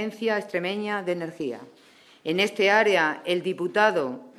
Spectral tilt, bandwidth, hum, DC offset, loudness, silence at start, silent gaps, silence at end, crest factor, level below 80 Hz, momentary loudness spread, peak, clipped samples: -4.5 dB/octave; 13.5 kHz; none; under 0.1%; -24 LUFS; 0 s; none; 0.1 s; 20 dB; -76 dBFS; 13 LU; -6 dBFS; under 0.1%